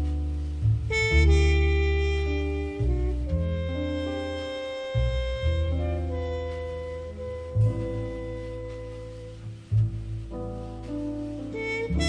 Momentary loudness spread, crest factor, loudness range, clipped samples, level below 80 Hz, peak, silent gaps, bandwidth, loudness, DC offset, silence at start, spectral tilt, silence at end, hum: 13 LU; 16 dB; 8 LU; under 0.1%; -30 dBFS; -10 dBFS; none; 9.8 kHz; -28 LUFS; under 0.1%; 0 s; -6.5 dB/octave; 0 s; none